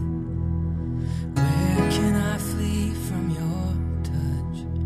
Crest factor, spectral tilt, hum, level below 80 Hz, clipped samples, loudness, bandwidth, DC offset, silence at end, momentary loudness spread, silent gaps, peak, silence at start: 14 dB; -6.5 dB/octave; none; -34 dBFS; under 0.1%; -25 LUFS; 15 kHz; under 0.1%; 0 s; 6 LU; none; -10 dBFS; 0 s